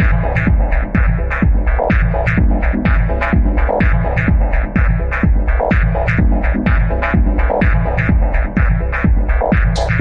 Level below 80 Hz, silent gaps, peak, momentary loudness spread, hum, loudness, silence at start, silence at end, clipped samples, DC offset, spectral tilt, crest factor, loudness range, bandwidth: -14 dBFS; none; -2 dBFS; 1 LU; none; -15 LUFS; 0 s; 0 s; under 0.1%; under 0.1%; -8.5 dB/octave; 10 dB; 0 LU; 6.8 kHz